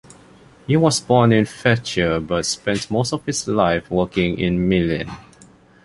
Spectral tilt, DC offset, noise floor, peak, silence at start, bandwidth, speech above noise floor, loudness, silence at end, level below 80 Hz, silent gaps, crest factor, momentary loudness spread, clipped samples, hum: -5 dB/octave; under 0.1%; -49 dBFS; -2 dBFS; 0.7 s; 11.5 kHz; 30 dB; -19 LUFS; 0.65 s; -42 dBFS; none; 18 dB; 7 LU; under 0.1%; none